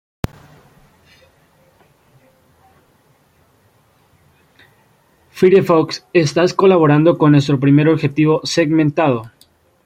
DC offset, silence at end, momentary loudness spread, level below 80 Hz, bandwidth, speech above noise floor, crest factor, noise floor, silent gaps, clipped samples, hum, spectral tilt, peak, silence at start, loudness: under 0.1%; 0.55 s; 6 LU; -50 dBFS; 14 kHz; 43 dB; 16 dB; -55 dBFS; none; under 0.1%; none; -7 dB/octave; -2 dBFS; 5.35 s; -14 LUFS